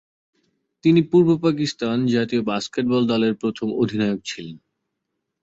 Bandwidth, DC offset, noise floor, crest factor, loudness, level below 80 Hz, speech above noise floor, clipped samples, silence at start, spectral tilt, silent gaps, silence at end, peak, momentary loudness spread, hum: 8 kHz; under 0.1%; -78 dBFS; 16 dB; -20 LUFS; -60 dBFS; 59 dB; under 0.1%; 0.85 s; -6.5 dB/octave; none; 0.85 s; -4 dBFS; 9 LU; none